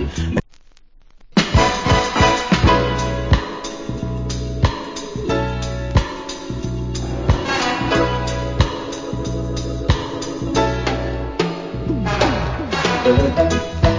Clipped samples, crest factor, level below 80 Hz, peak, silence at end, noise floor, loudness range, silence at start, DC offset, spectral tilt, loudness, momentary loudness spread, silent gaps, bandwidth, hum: under 0.1%; 18 dB; -26 dBFS; 0 dBFS; 0 s; -45 dBFS; 5 LU; 0 s; under 0.1%; -5.5 dB/octave; -20 LUFS; 11 LU; none; 7.6 kHz; none